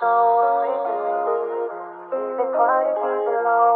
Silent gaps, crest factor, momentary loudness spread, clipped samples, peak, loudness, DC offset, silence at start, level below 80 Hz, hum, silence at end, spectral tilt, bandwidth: none; 12 dB; 11 LU; under 0.1%; -8 dBFS; -21 LUFS; under 0.1%; 0 s; -86 dBFS; none; 0 s; -8 dB/octave; 4.1 kHz